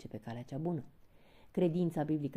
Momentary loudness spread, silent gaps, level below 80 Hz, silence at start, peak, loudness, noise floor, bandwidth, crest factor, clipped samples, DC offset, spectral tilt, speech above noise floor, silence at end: 12 LU; none; -66 dBFS; 0 s; -20 dBFS; -36 LUFS; -60 dBFS; 14.5 kHz; 16 dB; under 0.1%; under 0.1%; -9 dB/octave; 24 dB; 0 s